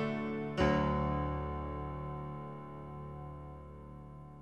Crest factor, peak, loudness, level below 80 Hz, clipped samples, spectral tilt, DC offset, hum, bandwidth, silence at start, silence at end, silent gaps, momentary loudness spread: 20 dB; -18 dBFS; -37 LUFS; -46 dBFS; under 0.1%; -8 dB/octave; 0.1%; 50 Hz at -65 dBFS; 8.6 kHz; 0 s; 0 s; none; 19 LU